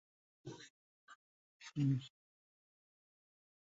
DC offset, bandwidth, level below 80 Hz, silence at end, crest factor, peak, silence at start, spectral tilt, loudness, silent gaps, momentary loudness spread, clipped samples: under 0.1%; 7.6 kHz; -80 dBFS; 1.7 s; 20 dB; -26 dBFS; 0.45 s; -7.5 dB/octave; -39 LUFS; 0.70-1.08 s, 1.15-1.60 s; 21 LU; under 0.1%